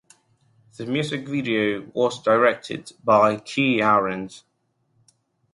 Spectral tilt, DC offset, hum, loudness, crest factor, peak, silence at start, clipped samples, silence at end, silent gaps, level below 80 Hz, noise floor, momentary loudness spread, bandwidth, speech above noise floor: -5.5 dB/octave; under 0.1%; none; -21 LUFS; 18 dB; -4 dBFS; 0.8 s; under 0.1%; 1.15 s; none; -64 dBFS; -69 dBFS; 14 LU; 11.5 kHz; 48 dB